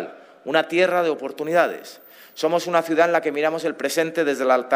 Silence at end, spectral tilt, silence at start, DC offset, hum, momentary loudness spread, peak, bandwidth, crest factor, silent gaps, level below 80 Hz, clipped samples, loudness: 0 s; -4 dB/octave; 0 s; under 0.1%; none; 16 LU; -2 dBFS; 15.5 kHz; 20 dB; none; -74 dBFS; under 0.1%; -21 LUFS